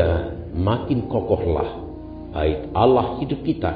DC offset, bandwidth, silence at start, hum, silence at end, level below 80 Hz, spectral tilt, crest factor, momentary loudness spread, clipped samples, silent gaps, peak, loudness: under 0.1%; 4.9 kHz; 0 s; none; 0 s; -34 dBFS; -11 dB/octave; 18 dB; 14 LU; under 0.1%; none; -2 dBFS; -22 LUFS